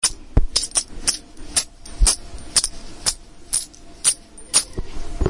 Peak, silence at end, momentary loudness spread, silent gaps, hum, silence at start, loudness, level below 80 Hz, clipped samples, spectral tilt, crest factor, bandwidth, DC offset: 0 dBFS; 0 s; 13 LU; none; none; 0 s; -21 LUFS; -28 dBFS; under 0.1%; -1.5 dB/octave; 22 dB; 11.5 kHz; under 0.1%